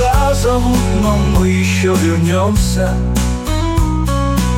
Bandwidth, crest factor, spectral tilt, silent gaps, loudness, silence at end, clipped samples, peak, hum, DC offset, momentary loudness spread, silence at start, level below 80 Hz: 17 kHz; 10 dB; -6 dB/octave; none; -14 LUFS; 0 s; under 0.1%; -2 dBFS; none; under 0.1%; 3 LU; 0 s; -18 dBFS